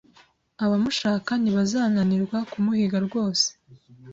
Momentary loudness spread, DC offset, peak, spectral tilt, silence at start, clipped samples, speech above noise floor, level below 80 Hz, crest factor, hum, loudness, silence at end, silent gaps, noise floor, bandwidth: 3 LU; under 0.1%; -10 dBFS; -5 dB/octave; 0.6 s; under 0.1%; 35 dB; -62 dBFS; 14 dB; none; -24 LUFS; 0 s; none; -58 dBFS; 8 kHz